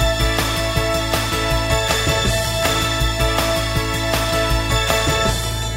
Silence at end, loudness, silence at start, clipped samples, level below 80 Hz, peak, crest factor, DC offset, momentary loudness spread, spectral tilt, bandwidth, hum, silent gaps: 0 s; -18 LUFS; 0 s; under 0.1%; -26 dBFS; 0 dBFS; 18 dB; under 0.1%; 2 LU; -3.5 dB/octave; 16.5 kHz; none; none